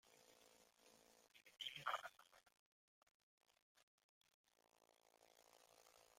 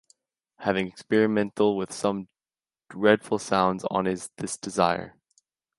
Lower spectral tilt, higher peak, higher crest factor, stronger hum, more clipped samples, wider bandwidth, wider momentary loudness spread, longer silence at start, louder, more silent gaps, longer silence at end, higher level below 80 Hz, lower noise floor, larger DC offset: second, -1 dB/octave vs -5 dB/octave; second, -32 dBFS vs -4 dBFS; first, 30 dB vs 22 dB; neither; neither; first, 16.5 kHz vs 11.5 kHz; first, 21 LU vs 11 LU; second, 0.05 s vs 0.6 s; second, -50 LUFS vs -26 LUFS; first, 2.59-3.41 s, 3.62-3.75 s, 3.83-4.21 s, 4.34-4.44 s vs none; second, 0.05 s vs 0.7 s; second, under -90 dBFS vs -62 dBFS; second, -78 dBFS vs under -90 dBFS; neither